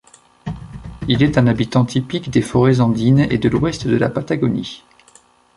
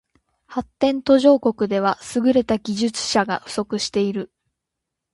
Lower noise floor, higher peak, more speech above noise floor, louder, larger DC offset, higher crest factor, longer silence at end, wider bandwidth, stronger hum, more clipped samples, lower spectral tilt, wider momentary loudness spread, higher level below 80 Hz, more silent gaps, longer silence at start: second, -51 dBFS vs -82 dBFS; about the same, -2 dBFS vs -4 dBFS; second, 35 dB vs 62 dB; first, -17 LUFS vs -20 LUFS; neither; about the same, 16 dB vs 18 dB; about the same, 0.8 s vs 0.9 s; about the same, 11.5 kHz vs 11.5 kHz; neither; neither; first, -7 dB/octave vs -4.5 dB/octave; first, 17 LU vs 14 LU; first, -40 dBFS vs -56 dBFS; neither; about the same, 0.45 s vs 0.5 s